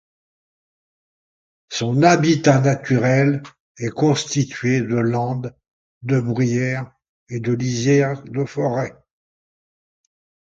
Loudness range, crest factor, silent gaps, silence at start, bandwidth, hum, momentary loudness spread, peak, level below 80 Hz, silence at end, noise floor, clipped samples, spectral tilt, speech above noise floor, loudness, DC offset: 5 LU; 20 dB; 3.60-3.75 s, 5.71-6.01 s, 7.09-7.26 s; 1.7 s; 7.8 kHz; none; 13 LU; 0 dBFS; -58 dBFS; 1.65 s; under -90 dBFS; under 0.1%; -6 dB/octave; over 72 dB; -19 LUFS; under 0.1%